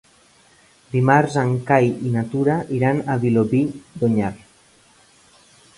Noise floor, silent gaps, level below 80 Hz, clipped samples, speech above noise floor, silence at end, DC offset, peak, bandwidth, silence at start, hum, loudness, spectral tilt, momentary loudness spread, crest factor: -54 dBFS; none; -54 dBFS; under 0.1%; 35 dB; 1.4 s; under 0.1%; 0 dBFS; 11.5 kHz; 0.95 s; none; -20 LUFS; -8 dB/octave; 7 LU; 20 dB